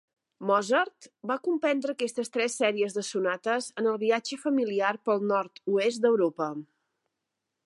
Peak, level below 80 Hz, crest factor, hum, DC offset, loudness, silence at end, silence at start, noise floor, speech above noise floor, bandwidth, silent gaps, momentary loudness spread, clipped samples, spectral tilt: -12 dBFS; -86 dBFS; 18 dB; none; under 0.1%; -28 LUFS; 1.05 s; 0.4 s; -84 dBFS; 57 dB; 11.5 kHz; none; 8 LU; under 0.1%; -4 dB/octave